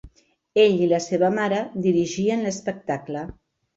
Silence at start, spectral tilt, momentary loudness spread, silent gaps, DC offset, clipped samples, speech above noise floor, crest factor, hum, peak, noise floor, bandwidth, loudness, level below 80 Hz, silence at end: 0.05 s; -5.5 dB/octave; 11 LU; none; under 0.1%; under 0.1%; 28 dB; 18 dB; none; -6 dBFS; -49 dBFS; 8 kHz; -22 LUFS; -54 dBFS; 0.45 s